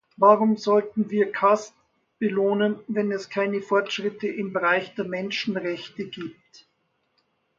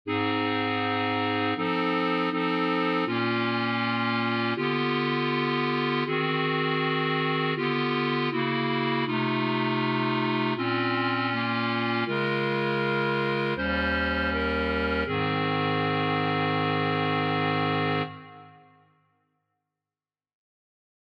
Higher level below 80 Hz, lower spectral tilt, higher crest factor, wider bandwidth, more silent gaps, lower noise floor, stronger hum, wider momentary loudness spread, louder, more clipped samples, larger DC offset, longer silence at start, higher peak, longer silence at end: second, -74 dBFS vs -50 dBFS; second, -5.5 dB/octave vs -7.5 dB/octave; first, 22 dB vs 14 dB; first, 7.6 kHz vs 6.4 kHz; neither; second, -72 dBFS vs under -90 dBFS; neither; first, 13 LU vs 1 LU; about the same, -24 LUFS vs -26 LUFS; neither; neither; first, 0.2 s vs 0.05 s; first, -4 dBFS vs -14 dBFS; second, 1.25 s vs 2.55 s